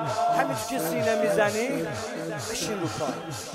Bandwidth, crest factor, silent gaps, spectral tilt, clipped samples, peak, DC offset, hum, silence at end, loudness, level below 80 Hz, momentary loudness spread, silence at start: 16 kHz; 18 dB; none; -4 dB/octave; under 0.1%; -8 dBFS; under 0.1%; none; 0 s; -27 LUFS; -60 dBFS; 9 LU; 0 s